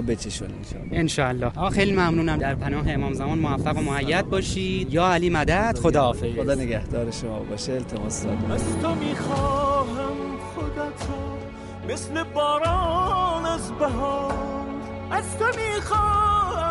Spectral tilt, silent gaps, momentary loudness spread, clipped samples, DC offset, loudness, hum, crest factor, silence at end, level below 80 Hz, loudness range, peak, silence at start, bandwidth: -5.5 dB/octave; none; 11 LU; under 0.1%; under 0.1%; -24 LUFS; none; 18 dB; 0 s; -36 dBFS; 4 LU; -6 dBFS; 0 s; 11.5 kHz